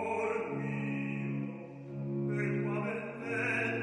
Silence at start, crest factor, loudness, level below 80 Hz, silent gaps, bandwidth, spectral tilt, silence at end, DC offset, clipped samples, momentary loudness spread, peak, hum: 0 s; 14 dB; -35 LUFS; -74 dBFS; none; 10.5 kHz; -7.5 dB/octave; 0 s; under 0.1%; under 0.1%; 9 LU; -20 dBFS; none